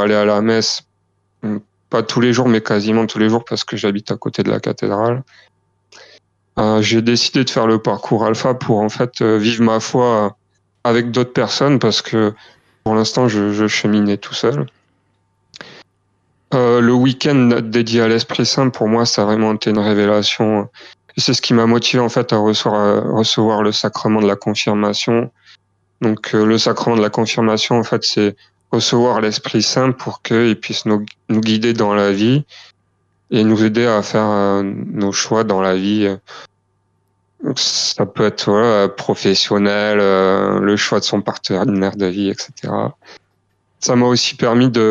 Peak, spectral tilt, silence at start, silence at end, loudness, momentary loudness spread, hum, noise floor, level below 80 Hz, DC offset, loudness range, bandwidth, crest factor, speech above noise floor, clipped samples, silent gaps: -2 dBFS; -5 dB/octave; 0 s; 0 s; -15 LUFS; 7 LU; none; -64 dBFS; -58 dBFS; under 0.1%; 4 LU; 8 kHz; 12 dB; 49 dB; under 0.1%; none